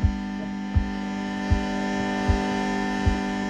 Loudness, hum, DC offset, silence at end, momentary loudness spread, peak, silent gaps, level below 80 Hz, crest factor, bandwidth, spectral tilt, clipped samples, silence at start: -26 LUFS; none; under 0.1%; 0 s; 5 LU; -8 dBFS; none; -32 dBFS; 16 dB; 10.5 kHz; -6.5 dB/octave; under 0.1%; 0 s